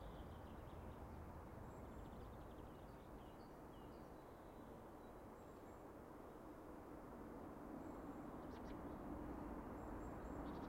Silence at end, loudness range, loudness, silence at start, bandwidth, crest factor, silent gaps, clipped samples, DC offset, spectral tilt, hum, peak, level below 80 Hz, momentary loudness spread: 0 s; 5 LU; -56 LUFS; 0 s; 16 kHz; 14 dB; none; under 0.1%; under 0.1%; -7.5 dB/octave; none; -40 dBFS; -62 dBFS; 7 LU